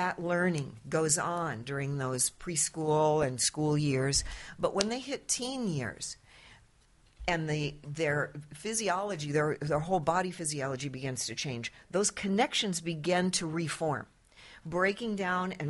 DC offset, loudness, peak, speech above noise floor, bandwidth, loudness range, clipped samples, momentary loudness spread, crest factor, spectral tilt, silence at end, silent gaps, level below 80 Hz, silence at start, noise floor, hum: under 0.1%; -31 LUFS; -4 dBFS; 32 dB; 11.5 kHz; 5 LU; under 0.1%; 9 LU; 28 dB; -4 dB/octave; 0 s; none; -56 dBFS; 0 s; -64 dBFS; none